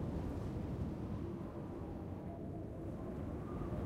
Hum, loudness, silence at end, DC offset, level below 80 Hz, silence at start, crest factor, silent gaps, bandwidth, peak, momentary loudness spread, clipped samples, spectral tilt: none; -45 LUFS; 0 s; under 0.1%; -52 dBFS; 0 s; 14 dB; none; 15 kHz; -30 dBFS; 4 LU; under 0.1%; -9 dB/octave